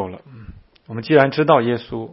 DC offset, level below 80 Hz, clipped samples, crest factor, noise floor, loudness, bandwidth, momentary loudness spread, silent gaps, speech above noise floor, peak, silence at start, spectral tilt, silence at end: under 0.1%; -50 dBFS; under 0.1%; 20 dB; -41 dBFS; -16 LUFS; 5.8 kHz; 18 LU; none; 24 dB; 0 dBFS; 0 s; -9.5 dB/octave; 0 s